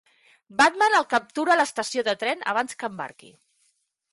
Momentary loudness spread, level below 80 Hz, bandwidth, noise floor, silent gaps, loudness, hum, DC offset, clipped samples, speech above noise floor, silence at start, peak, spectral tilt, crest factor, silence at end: 13 LU; -72 dBFS; 11.5 kHz; -70 dBFS; none; -23 LUFS; none; under 0.1%; under 0.1%; 47 dB; 0.55 s; -8 dBFS; -2 dB/octave; 18 dB; 1.05 s